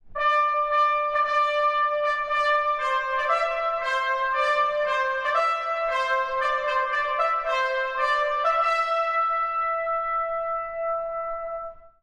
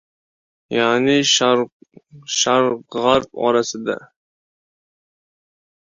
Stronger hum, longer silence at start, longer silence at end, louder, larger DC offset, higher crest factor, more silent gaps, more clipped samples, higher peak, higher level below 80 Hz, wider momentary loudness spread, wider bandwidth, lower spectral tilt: neither; second, 0.05 s vs 0.7 s; second, 0.15 s vs 1.95 s; second, -24 LUFS vs -17 LUFS; neither; second, 14 dB vs 20 dB; second, none vs 1.72-1.80 s; neither; second, -12 dBFS vs -2 dBFS; first, -54 dBFS vs -60 dBFS; second, 6 LU vs 11 LU; first, 10.5 kHz vs 7.6 kHz; second, -0.5 dB/octave vs -3 dB/octave